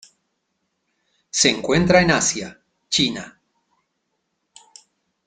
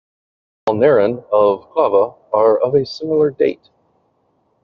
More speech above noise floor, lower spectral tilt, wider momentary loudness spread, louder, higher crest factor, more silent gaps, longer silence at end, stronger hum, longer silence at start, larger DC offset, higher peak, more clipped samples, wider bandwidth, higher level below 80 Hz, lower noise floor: first, 56 dB vs 47 dB; second, -3 dB/octave vs -5.5 dB/octave; first, 18 LU vs 6 LU; about the same, -18 LUFS vs -16 LUFS; first, 22 dB vs 14 dB; neither; first, 1.95 s vs 1.1 s; neither; first, 1.35 s vs 0.65 s; neither; about the same, -2 dBFS vs -2 dBFS; neither; first, 9.6 kHz vs 6.6 kHz; first, -50 dBFS vs -60 dBFS; first, -74 dBFS vs -63 dBFS